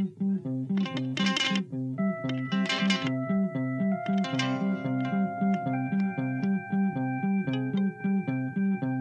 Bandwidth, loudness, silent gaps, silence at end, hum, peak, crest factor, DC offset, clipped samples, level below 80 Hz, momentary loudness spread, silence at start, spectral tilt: 8.6 kHz; -29 LUFS; none; 0 s; none; -12 dBFS; 18 dB; under 0.1%; under 0.1%; -72 dBFS; 4 LU; 0 s; -6 dB/octave